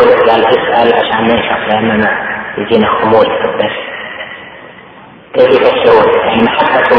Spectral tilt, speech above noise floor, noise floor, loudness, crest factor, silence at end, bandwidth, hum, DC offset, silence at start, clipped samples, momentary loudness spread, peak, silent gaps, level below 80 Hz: -7.5 dB/octave; 26 dB; -35 dBFS; -10 LUFS; 10 dB; 0 s; 5.4 kHz; none; under 0.1%; 0 s; 0.8%; 14 LU; 0 dBFS; none; -44 dBFS